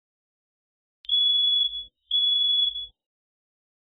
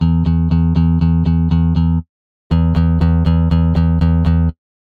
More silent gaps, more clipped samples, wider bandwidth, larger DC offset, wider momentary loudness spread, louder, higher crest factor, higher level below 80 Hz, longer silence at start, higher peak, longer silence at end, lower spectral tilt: second, none vs 2.09-2.50 s; neither; about the same, 4.3 kHz vs 4.7 kHz; neither; first, 17 LU vs 3 LU; second, -21 LUFS vs -15 LUFS; about the same, 12 dB vs 12 dB; second, -62 dBFS vs -20 dBFS; first, 1.1 s vs 0 s; second, -16 dBFS vs -2 dBFS; first, 1.1 s vs 0.45 s; second, 3.5 dB/octave vs -10.5 dB/octave